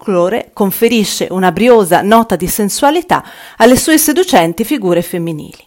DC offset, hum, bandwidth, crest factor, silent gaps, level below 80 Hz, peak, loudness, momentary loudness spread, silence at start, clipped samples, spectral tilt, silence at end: under 0.1%; none; 17 kHz; 12 dB; none; -40 dBFS; 0 dBFS; -11 LUFS; 7 LU; 0.05 s; 1%; -4 dB/octave; 0.15 s